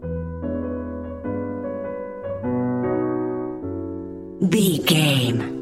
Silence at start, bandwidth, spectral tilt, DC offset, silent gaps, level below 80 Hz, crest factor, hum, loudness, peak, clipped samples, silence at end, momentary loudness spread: 0 s; 16 kHz; -5.5 dB/octave; 0.1%; none; -44 dBFS; 20 dB; none; -23 LUFS; -4 dBFS; under 0.1%; 0 s; 13 LU